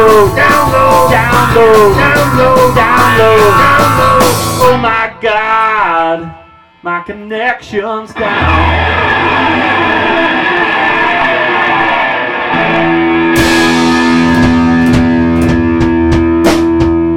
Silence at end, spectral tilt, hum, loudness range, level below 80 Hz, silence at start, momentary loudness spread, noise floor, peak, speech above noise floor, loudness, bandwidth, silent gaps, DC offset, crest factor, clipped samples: 0 s; -5 dB/octave; none; 6 LU; -26 dBFS; 0 s; 8 LU; -38 dBFS; 0 dBFS; 29 dB; -9 LUFS; 18 kHz; none; 2%; 8 dB; under 0.1%